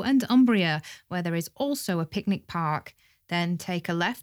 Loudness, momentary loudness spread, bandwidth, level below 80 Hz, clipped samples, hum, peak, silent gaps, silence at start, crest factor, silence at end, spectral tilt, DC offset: -27 LUFS; 11 LU; 17.5 kHz; -64 dBFS; under 0.1%; none; -10 dBFS; none; 0 s; 16 dB; 0 s; -5.5 dB/octave; under 0.1%